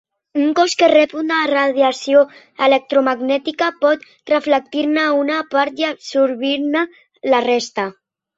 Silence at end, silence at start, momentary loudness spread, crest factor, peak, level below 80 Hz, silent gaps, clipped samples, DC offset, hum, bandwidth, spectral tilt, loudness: 0.45 s; 0.35 s; 8 LU; 16 dB; -2 dBFS; -66 dBFS; none; under 0.1%; under 0.1%; none; 8 kHz; -3 dB/octave; -17 LUFS